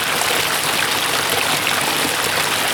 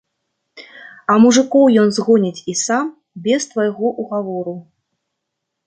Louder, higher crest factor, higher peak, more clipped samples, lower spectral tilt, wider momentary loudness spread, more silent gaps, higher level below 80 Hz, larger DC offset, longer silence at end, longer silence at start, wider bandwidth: about the same, -16 LUFS vs -16 LUFS; about the same, 18 dB vs 16 dB; about the same, -2 dBFS vs -2 dBFS; neither; second, -1 dB/octave vs -4.5 dB/octave; second, 1 LU vs 15 LU; neither; first, -52 dBFS vs -64 dBFS; neither; second, 0 s vs 1.05 s; second, 0 s vs 0.55 s; first, over 20 kHz vs 9.4 kHz